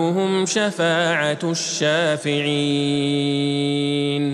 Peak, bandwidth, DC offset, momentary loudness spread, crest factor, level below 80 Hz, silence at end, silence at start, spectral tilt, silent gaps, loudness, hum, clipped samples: -6 dBFS; 12 kHz; under 0.1%; 2 LU; 14 dB; -68 dBFS; 0 s; 0 s; -4.5 dB/octave; none; -20 LUFS; none; under 0.1%